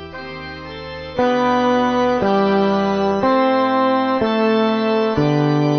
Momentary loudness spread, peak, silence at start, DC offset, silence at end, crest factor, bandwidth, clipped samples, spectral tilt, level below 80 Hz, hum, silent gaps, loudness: 14 LU; -4 dBFS; 0 s; under 0.1%; 0 s; 14 dB; 6.6 kHz; under 0.1%; -7 dB/octave; -46 dBFS; none; none; -17 LUFS